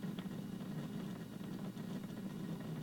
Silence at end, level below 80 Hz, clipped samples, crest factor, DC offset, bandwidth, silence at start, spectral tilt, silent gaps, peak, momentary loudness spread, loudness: 0 s; -70 dBFS; under 0.1%; 14 dB; under 0.1%; 17.5 kHz; 0 s; -7 dB/octave; none; -30 dBFS; 2 LU; -46 LUFS